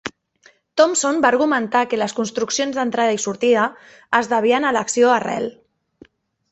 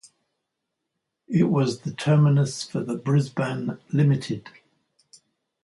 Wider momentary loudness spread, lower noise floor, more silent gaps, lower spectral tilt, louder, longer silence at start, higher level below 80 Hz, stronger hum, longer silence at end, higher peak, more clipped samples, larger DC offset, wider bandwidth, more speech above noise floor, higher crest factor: about the same, 8 LU vs 10 LU; second, -55 dBFS vs -81 dBFS; neither; second, -3 dB/octave vs -7 dB/octave; first, -18 LUFS vs -24 LUFS; second, 0.05 s vs 1.3 s; about the same, -64 dBFS vs -64 dBFS; neither; second, 1 s vs 1.15 s; first, -2 dBFS vs -8 dBFS; neither; neither; second, 8.4 kHz vs 11.5 kHz; second, 37 dB vs 59 dB; about the same, 18 dB vs 16 dB